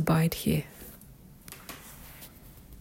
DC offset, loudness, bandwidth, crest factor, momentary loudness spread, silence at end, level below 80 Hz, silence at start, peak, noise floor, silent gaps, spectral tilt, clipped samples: under 0.1%; -29 LUFS; 16.5 kHz; 20 dB; 25 LU; 0 s; -52 dBFS; 0 s; -12 dBFS; -52 dBFS; none; -6 dB/octave; under 0.1%